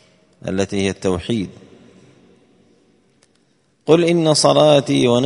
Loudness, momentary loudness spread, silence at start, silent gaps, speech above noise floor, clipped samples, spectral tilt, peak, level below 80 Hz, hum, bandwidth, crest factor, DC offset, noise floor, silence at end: -16 LUFS; 15 LU; 0.45 s; none; 45 dB; under 0.1%; -5 dB/octave; 0 dBFS; -52 dBFS; none; 11 kHz; 18 dB; under 0.1%; -61 dBFS; 0 s